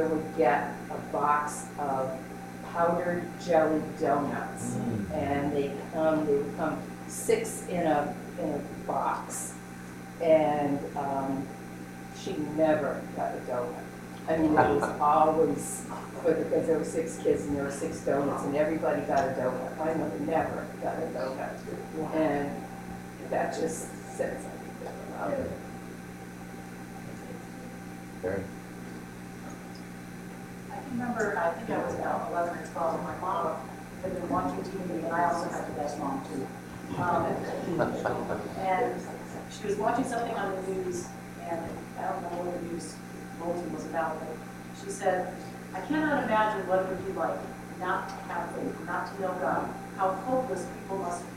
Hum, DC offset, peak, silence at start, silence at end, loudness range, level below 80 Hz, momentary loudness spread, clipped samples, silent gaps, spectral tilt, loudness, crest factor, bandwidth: 60 Hz at -45 dBFS; under 0.1%; -8 dBFS; 0 s; 0 s; 9 LU; -58 dBFS; 15 LU; under 0.1%; none; -6 dB/octave; -31 LUFS; 22 dB; 16 kHz